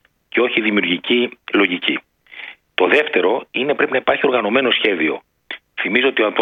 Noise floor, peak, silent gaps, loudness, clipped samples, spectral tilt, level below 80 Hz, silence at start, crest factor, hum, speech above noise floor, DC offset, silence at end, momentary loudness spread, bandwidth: -37 dBFS; 0 dBFS; none; -17 LUFS; under 0.1%; -6 dB/octave; -66 dBFS; 0.35 s; 18 dB; none; 20 dB; under 0.1%; 0 s; 15 LU; 6.6 kHz